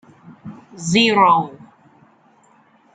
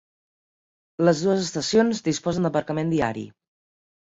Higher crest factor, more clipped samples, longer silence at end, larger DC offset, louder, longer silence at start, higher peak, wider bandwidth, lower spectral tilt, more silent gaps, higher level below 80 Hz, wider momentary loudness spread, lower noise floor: about the same, 18 dB vs 20 dB; neither; first, 1.45 s vs 0.85 s; neither; first, -15 LUFS vs -23 LUFS; second, 0.3 s vs 1 s; first, -2 dBFS vs -6 dBFS; first, 9.4 kHz vs 8 kHz; second, -4 dB/octave vs -5.5 dB/octave; neither; second, -64 dBFS vs -58 dBFS; first, 26 LU vs 11 LU; second, -54 dBFS vs under -90 dBFS